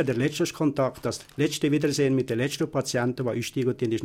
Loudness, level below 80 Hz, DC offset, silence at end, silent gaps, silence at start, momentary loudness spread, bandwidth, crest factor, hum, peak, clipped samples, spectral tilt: -26 LUFS; -58 dBFS; under 0.1%; 0 s; none; 0 s; 4 LU; 16.5 kHz; 14 dB; none; -10 dBFS; under 0.1%; -5.5 dB/octave